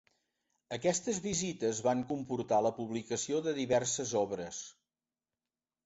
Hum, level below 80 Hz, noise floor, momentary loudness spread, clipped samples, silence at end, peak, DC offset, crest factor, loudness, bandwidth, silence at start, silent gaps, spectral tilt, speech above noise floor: none; -70 dBFS; under -90 dBFS; 9 LU; under 0.1%; 1.15 s; -16 dBFS; under 0.1%; 18 dB; -34 LUFS; 8 kHz; 0.7 s; none; -4.5 dB/octave; over 56 dB